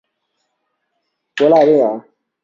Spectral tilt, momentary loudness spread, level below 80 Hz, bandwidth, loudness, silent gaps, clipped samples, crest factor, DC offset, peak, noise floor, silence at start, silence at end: -6.5 dB/octave; 19 LU; -64 dBFS; 7.4 kHz; -13 LUFS; none; under 0.1%; 16 dB; under 0.1%; -2 dBFS; -72 dBFS; 1.35 s; 0.45 s